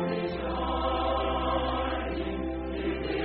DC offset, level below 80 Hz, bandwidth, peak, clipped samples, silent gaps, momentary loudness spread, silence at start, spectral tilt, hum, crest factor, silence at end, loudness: under 0.1%; -38 dBFS; 4.6 kHz; -16 dBFS; under 0.1%; none; 4 LU; 0 s; -4.5 dB/octave; none; 14 dB; 0 s; -30 LUFS